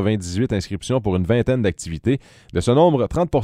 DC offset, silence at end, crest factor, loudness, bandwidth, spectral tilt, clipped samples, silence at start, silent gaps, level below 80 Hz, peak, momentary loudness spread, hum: under 0.1%; 0 s; 16 dB; -20 LUFS; 13 kHz; -6.5 dB/octave; under 0.1%; 0 s; none; -38 dBFS; -2 dBFS; 9 LU; none